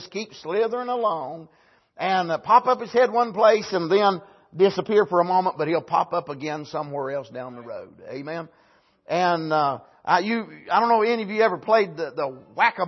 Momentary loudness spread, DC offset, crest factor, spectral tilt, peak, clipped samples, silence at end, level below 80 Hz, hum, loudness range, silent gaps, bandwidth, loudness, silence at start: 16 LU; under 0.1%; 20 dB; -5.5 dB/octave; -4 dBFS; under 0.1%; 0 s; -72 dBFS; none; 8 LU; none; 6.2 kHz; -22 LUFS; 0 s